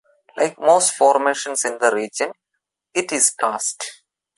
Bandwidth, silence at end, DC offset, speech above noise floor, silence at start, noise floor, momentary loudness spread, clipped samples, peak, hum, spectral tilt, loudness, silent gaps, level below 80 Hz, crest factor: 12 kHz; 0.45 s; under 0.1%; 59 dB; 0.35 s; -78 dBFS; 11 LU; under 0.1%; -2 dBFS; none; -1 dB/octave; -19 LUFS; none; -74 dBFS; 18 dB